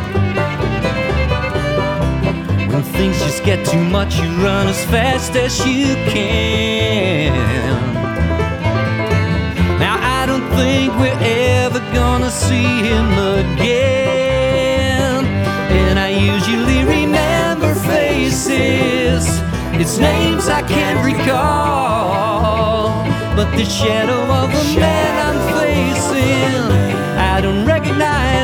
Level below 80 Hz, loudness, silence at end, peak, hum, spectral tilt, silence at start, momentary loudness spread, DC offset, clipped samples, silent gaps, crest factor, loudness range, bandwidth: -26 dBFS; -15 LUFS; 0 s; 0 dBFS; none; -5.5 dB/octave; 0 s; 3 LU; under 0.1%; under 0.1%; none; 14 dB; 2 LU; 19 kHz